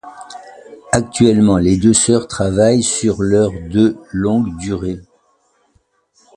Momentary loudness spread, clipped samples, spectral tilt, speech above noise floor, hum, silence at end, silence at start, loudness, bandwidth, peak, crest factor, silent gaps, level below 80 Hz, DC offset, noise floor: 16 LU; under 0.1%; -5 dB/octave; 46 dB; none; 1.35 s; 0.05 s; -15 LUFS; 11.5 kHz; 0 dBFS; 16 dB; none; -38 dBFS; under 0.1%; -60 dBFS